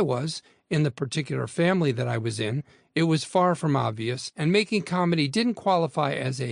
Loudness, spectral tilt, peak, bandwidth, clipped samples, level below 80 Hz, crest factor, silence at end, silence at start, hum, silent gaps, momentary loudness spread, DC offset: -25 LUFS; -6 dB/octave; -8 dBFS; 10.5 kHz; under 0.1%; -66 dBFS; 16 dB; 0 s; 0 s; none; none; 7 LU; under 0.1%